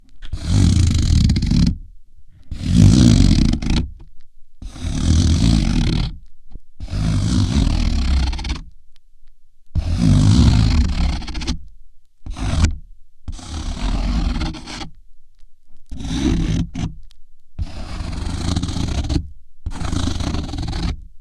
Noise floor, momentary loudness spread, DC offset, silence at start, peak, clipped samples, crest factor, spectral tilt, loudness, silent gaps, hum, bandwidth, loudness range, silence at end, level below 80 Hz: -37 dBFS; 18 LU; under 0.1%; 0.1 s; 0 dBFS; under 0.1%; 18 dB; -6 dB/octave; -19 LUFS; none; none; 11.5 kHz; 10 LU; 0 s; -24 dBFS